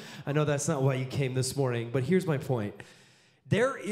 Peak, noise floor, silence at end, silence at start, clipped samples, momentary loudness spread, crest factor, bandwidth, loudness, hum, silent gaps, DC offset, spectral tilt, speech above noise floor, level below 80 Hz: -12 dBFS; -59 dBFS; 0 s; 0 s; under 0.1%; 5 LU; 16 dB; 15 kHz; -29 LUFS; none; none; under 0.1%; -6 dB/octave; 30 dB; -66 dBFS